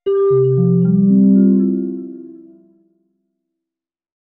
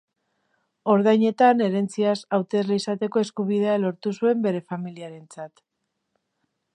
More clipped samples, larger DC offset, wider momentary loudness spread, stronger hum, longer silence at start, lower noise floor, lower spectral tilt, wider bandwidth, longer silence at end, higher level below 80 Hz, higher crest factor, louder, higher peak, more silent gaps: neither; neither; second, 17 LU vs 21 LU; neither; second, 0.05 s vs 0.85 s; first, -87 dBFS vs -76 dBFS; first, -14 dB/octave vs -6.5 dB/octave; second, 3.1 kHz vs 10.5 kHz; first, 1.85 s vs 1.25 s; first, -64 dBFS vs -76 dBFS; second, 12 dB vs 20 dB; first, -13 LUFS vs -22 LUFS; about the same, -2 dBFS vs -4 dBFS; neither